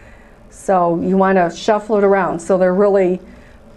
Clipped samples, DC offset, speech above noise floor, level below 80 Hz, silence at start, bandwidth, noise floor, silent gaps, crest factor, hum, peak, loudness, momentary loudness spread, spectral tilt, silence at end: under 0.1%; under 0.1%; 27 dB; -46 dBFS; 0.6 s; 11.5 kHz; -42 dBFS; none; 14 dB; none; -2 dBFS; -15 LUFS; 5 LU; -6.5 dB/octave; 0.45 s